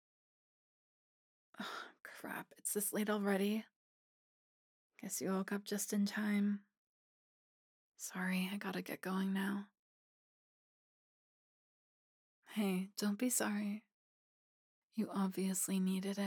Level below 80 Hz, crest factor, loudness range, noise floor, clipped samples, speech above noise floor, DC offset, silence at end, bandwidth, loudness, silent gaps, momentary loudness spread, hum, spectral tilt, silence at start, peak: under -90 dBFS; 20 dB; 5 LU; under -90 dBFS; under 0.1%; over 51 dB; under 0.1%; 0 s; 19 kHz; -39 LUFS; 3.76-4.90 s, 6.78-7.92 s, 9.79-12.42 s, 13.94-14.89 s; 11 LU; none; -4.5 dB/octave; 1.6 s; -22 dBFS